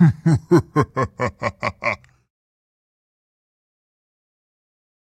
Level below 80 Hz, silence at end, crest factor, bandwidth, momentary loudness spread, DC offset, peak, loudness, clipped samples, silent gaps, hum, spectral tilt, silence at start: -48 dBFS; 3.2 s; 20 dB; 9.2 kHz; 9 LU; under 0.1%; -4 dBFS; -21 LUFS; under 0.1%; none; none; -8 dB/octave; 0 s